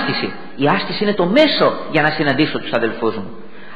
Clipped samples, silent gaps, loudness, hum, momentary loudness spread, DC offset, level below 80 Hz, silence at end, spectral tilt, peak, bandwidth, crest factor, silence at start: under 0.1%; none; -17 LUFS; none; 9 LU; 3%; -52 dBFS; 0 s; -7 dB/octave; 0 dBFS; 7.8 kHz; 16 dB; 0 s